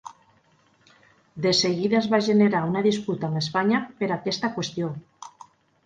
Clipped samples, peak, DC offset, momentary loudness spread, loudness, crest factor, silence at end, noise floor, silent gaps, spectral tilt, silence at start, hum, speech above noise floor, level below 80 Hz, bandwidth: under 0.1%; -8 dBFS; under 0.1%; 11 LU; -23 LUFS; 18 dB; 0.6 s; -62 dBFS; none; -5 dB/octave; 0.05 s; none; 39 dB; -66 dBFS; 9.2 kHz